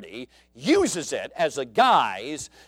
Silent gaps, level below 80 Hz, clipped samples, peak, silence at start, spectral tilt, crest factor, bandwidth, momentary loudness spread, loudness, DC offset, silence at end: none; -60 dBFS; under 0.1%; -8 dBFS; 0 s; -3 dB/octave; 18 dB; 16.5 kHz; 15 LU; -23 LUFS; under 0.1%; 0.2 s